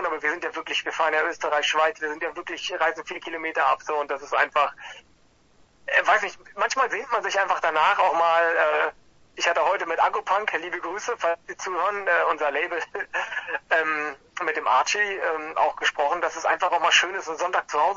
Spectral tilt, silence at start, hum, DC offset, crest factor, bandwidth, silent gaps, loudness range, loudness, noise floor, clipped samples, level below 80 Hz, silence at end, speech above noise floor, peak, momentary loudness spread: -0.5 dB/octave; 0 s; none; under 0.1%; 18 dB; 8 kHz; none; 4 LU; -24 LUFS; -58 dBFS; under 0.1%; -66 dBFS; 0 s; 34 dB; -6 dBFS; 10 LU